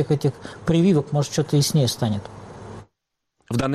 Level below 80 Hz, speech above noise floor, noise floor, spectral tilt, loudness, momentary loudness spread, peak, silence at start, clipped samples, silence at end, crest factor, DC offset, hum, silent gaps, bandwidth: -52 dBFS; 57 dB; -78 dBFS; -6 dB/octave; -21 LUFS; 21 LU; -8 dBFS; 0 s; under 0.1%; 0 s; 14 dB; under 0.1%; none; none; 14.5 kHz